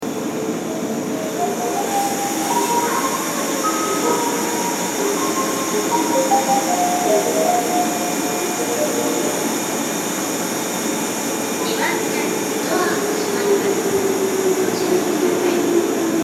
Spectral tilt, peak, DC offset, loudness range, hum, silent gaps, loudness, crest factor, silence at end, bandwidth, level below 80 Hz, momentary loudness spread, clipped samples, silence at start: -3 dB/octave; -4 dBFS; under 0.1%; 3 LU; none; none; -19 LUFS; 14 dB; 0 s; 16.5 kHz; -62 dBFS; 4 LU; under 0.1%; 0 s